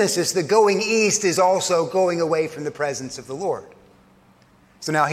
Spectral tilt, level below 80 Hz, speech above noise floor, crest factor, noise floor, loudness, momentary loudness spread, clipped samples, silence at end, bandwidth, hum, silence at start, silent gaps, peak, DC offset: -3.5 dB/octave; -66 dBFS; 34 dB; 16 dB; -54 dBFS; -20 LUFS; 11 LU; under 0.1%; 0 s; 16 kHz; none; 0 s; none; -4 dBFS; under 0.1%